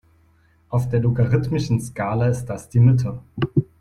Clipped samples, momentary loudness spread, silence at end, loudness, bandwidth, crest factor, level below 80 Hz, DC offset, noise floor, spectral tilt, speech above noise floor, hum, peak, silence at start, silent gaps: under 0.1%; 9 LU; 0.15 s; -21 LUFS; 11.5 kHz; 16 dB; -46 dBFS; under 0.1%; -57 dBFS; -8 dB/octave; 38 dB; none; -4 dBFS; 0.7 s; none